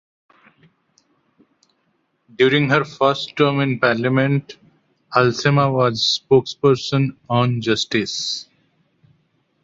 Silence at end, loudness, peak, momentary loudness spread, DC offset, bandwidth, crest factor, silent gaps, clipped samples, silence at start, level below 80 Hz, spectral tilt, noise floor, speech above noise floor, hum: 1.2 s; -18 LUFS; -2 dBFS; 5 LU; under 0.1%; 7.8 kHz; 18 dB; none; under 0.1%; 2.4 s; -58 dBFS; -5.5 dB/octave; -67 dBFS; 49 dB; none